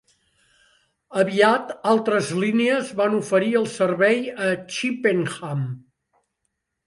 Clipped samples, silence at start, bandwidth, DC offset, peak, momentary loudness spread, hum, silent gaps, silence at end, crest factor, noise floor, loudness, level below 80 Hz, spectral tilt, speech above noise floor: under 0.1%; 1.1 s; 11.5 kHz; under 0.1%; -2 dBFS; 10 LU; none; none; 1.05 s; 20 dB; -77 dBFS; -21 LUFS; -70 dBFS; -5.5 dB/octave; 56 dB